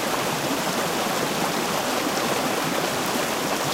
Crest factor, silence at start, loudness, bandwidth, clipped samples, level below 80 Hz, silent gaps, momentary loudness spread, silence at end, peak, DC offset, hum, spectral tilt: 14 dB; 0 s; -24 LUFS; 16 kHz; under 0.1%; -56 dBFS; none; 1 LU; 0 s; -10 dBFS; under 0.1%; none; -3 dB/octave